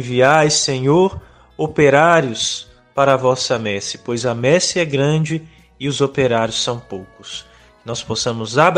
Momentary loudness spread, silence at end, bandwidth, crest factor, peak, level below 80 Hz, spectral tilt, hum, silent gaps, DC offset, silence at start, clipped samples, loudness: 16 LU; 0 s; 10.5 kHz; 16 dB; 0 dBFS; -50 dBFS; -4 dB/octave; none; none; under 0.1%; 0 s; under 0.1%; -16 LUFS